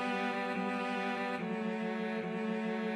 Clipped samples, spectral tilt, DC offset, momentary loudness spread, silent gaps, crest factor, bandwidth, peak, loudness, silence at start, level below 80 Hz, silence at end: under 0.1%; -6 dB/octave; under 0.1%; 2 LU; none; 12 dB; 11.5 kHz; -24 dBFS; -36 LUFS; 0 s; -88 dBFS; 0 s